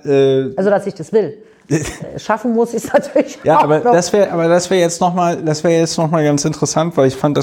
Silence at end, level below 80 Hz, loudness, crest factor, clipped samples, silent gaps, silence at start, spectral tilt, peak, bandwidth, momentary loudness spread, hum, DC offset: 0 s; -48 dBFS; -15 LUFS; 14 dB; under 0.1%; none; 0.05 s; -5.5 dB/octave; -2 dBFS; 16.5 kHz; 7 LU; none; under 0.1%